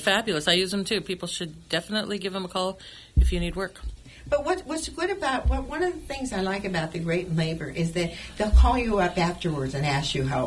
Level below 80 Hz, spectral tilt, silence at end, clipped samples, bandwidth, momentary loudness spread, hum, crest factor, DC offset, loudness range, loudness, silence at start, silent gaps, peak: -30 dBFS; -5 dB/octave; 0 s; under 0.1%; 12 kHz; 9 LU; none; 18 dB; under 0.1%; 4 LU; -26 LUFS; 0 s; none; -8 dBFS